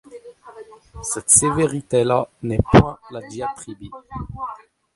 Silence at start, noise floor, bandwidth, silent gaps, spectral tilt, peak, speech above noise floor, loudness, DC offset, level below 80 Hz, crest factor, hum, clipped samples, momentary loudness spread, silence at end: 0.1 s; -42 dBFS; 12 kHz; none; -4.5 dB/octave; 0 dBFS; 22 dB; -18 LUFS; under 0.1%; -38 dBFS; 22 dB; none; under 0.1%; 21 LU; 0.4 s